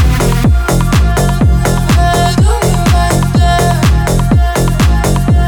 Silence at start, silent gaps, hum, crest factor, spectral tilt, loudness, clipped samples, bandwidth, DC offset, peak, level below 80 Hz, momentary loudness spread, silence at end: 0 s; none; none; 8 dB; -6 dB/octave; -11 LUFS; under 0.1%; 19.5 kHz; under 0.1%; 0 dBFS; -12 dBFS; 2 LU; 0 s